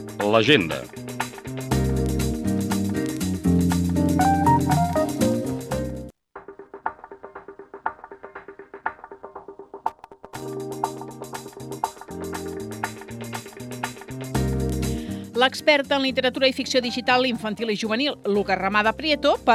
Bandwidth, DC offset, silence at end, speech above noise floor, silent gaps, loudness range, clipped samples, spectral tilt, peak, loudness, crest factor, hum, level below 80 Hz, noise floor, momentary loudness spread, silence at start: 15.5 kHz; under 0.1%; 0 s; 23 dB; none; 14 LU; under 0.1%; -5 dB/octave; -4 dBFS; -23 LUFS; 20 dB; none; -40 dBFS; -44 dBFS; 21 LU; 0 s